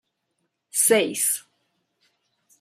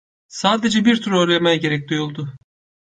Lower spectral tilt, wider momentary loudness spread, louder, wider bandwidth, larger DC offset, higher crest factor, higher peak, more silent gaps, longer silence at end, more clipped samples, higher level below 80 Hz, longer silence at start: second, -1.5 dB/octave vs -5 dB/octave; second, 10 LU vs 14 LU; second, -21 LUFS vs -18 LUFS; first, 15.5 kHz vs 9.6 kHz; neither; about the same, 20 dB vs 18 dB; second, -6 dBFS vs -2 dBFS; neither; first, 1.2 s vs 0.5 s; neither; second, -80 dBFS vs -58 dBFS; first, 0.75 s vs 0.3 s